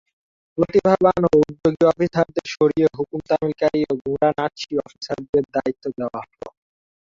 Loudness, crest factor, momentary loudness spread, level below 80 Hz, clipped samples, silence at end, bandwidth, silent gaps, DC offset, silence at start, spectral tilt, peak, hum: -20 LUFS; 18 dB; 13 LU; -52 dBFS; under 0.1%; 0.55 s; 7.6 kHz; 4.01-4.05 s, 5.29-5.33 s; under 0.1%; 0.55 s; -7 dB/octave; -2 dBFS; none